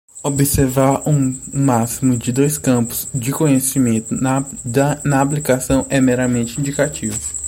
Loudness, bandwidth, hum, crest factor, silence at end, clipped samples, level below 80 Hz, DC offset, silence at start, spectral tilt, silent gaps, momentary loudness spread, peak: -17 LUFS; 16.5 kHz; none; 16 dB; 0 s; under 0.1%; -38 dBFS; under 0.1%; 0.15 s; -5.5 dB/octave; none; 6 LU; -2 dBFS